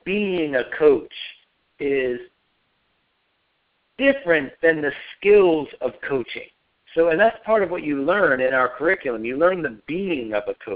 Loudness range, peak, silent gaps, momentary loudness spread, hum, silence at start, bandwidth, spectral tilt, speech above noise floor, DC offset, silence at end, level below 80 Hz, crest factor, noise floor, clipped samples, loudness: 5 LU; -4 dBFS; none; 11 LU; none; 0.05 s; 5 kHz; -3.5 dB/octave; 49 dB; under 0.1%; 0 s; -56 dBFS; 18 dB; -69 dBFS; under 0.1%; -21 LUFS